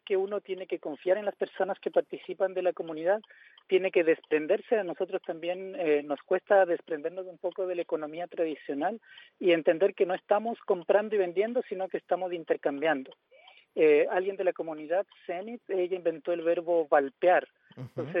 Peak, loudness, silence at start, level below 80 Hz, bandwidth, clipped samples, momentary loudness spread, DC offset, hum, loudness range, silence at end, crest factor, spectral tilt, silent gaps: -12 dBFS; -29 LUFS; 0.1 s; under -90 dBFS; 4.9 kHz; under 0.1%; 11 LU; under 0.1%; none; 2 LU; 0 s; 18 dB; -8.5 dB/octave; none